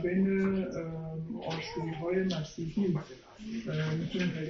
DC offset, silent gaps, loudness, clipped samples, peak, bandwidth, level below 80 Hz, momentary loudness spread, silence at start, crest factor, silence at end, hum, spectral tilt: under 0.1%; none; -33 LUFS; under 0.1%; -18 dBFS; 6.8 kHz; -58 dBFS; 10 LU; 0 s; 14 dB; 0 s; none; -6.5 dB/octave